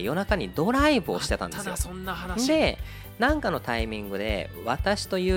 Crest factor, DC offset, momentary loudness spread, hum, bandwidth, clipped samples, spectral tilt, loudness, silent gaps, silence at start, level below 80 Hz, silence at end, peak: 18 dB; under 0.1%; 9 LU; none; 17.5 kHz; under 0.1%; -4.5 dB/octave; -26 LUFS; none; 0 s; -36 dBFS; 0 s; -8 dBFS